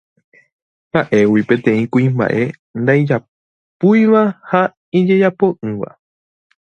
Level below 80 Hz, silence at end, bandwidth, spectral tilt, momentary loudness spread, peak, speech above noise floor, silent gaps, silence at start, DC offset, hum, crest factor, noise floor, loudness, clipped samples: -56 dBFS; 0.8 s; 6.6 kHz; -8.5 dB/octave; 8 LU; 0 dBFS; over 76 dB; 2.59-2.74 s, 3.28-3.80 s, 4.77-4.92 s; 0.95 s; under 0.1%; none; 16 dB; under -90 dBFS; -15 LUFS; under 0.1%